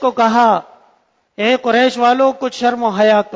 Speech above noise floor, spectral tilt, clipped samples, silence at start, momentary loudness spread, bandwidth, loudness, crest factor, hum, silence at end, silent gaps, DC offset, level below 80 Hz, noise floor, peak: 44 dB; -4.5 dB/octave; under 0.1%; 0 s; 5 LU; 8 kHz; -14 LUFS; 14 dB; none; 0 s; none; under 0.1%; -64 dBFS; -57 dBFS; 0 dBFS